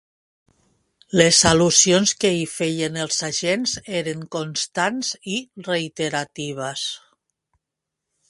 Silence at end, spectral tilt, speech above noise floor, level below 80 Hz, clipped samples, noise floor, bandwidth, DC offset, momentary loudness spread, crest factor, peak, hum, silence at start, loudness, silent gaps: 1.35 s; -3 dB/octave; 62 dB; -50 dBFS; under 0.1%; -83 dBFS; 11.5 kHz; under 0.1%; 14 LU; 22 dB; 0 dBFS; none; 1.1 s; -20 LUFS; none